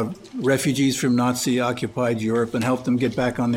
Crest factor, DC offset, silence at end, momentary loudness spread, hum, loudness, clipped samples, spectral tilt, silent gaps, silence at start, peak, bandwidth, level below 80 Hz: 16 dB; under 0.1%; 0 s; 4 LU; none; -22 LUFS; under 0.1%; -5 dB/octave; none; 0 s; -6 dBFS; 16.5 kHz; -54 dBFS